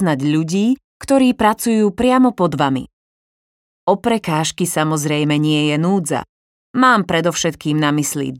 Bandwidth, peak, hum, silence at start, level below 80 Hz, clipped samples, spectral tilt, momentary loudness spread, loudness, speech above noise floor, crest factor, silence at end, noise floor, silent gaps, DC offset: 16.5 kHz; 0 dBFS; none; 0 s; -50 dBFS; under 0.1%; -5 dB/octave; 6 LU; -17 LUFS; over 74 dB; 16 dB; 0 s; under -90 dBFS; 0.84-1.00 s, 2.93-3.87 s, 6.29-6.74 s; under 0.1%